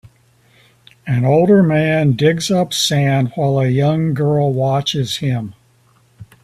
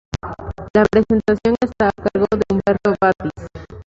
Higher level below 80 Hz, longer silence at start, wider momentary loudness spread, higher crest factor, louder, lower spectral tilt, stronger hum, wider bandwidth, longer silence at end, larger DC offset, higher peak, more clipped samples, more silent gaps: second, -52 dBFS vs -38 dBFS; first, 1.05 s vs 0.15 s; second, 8 LU vs 15 LU; about the same, 14 dB vs 16 dB; about the same, -15 LUFS vs -17 LUFS; second, -6 dB/octave vs -7.5 dB/octave; neither; first, 15 kHz vs 7.6 kHz; first, 0.2 s vs 0.05 s; neither; about the same, -2 dBFS vs -2 dBFS; neither; second, none vs 0.70-0.74 s